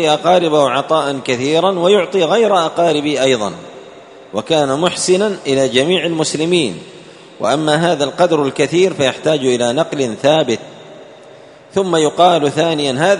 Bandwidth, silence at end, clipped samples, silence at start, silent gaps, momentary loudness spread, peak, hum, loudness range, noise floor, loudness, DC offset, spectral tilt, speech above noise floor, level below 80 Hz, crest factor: 11 kHz; 0 s; under 0.1%; 0 s; none; 7 LU; 0 dBFS; none; 2 LU; -39 dBFS; -14 LUFS; under 0.1%; -4.5 dB/octave; 26 dB; -58 dBFS; 14 dB